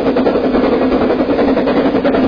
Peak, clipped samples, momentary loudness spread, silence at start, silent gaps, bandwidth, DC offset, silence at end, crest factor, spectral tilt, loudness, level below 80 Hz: -2 dBFS; under 0.1%; 1 LU; 0 s; none; 5.2 kHz; under 0.1%; 0 s; 10 dB; -8 dB/octave; -13 LUFS; -34 dBFS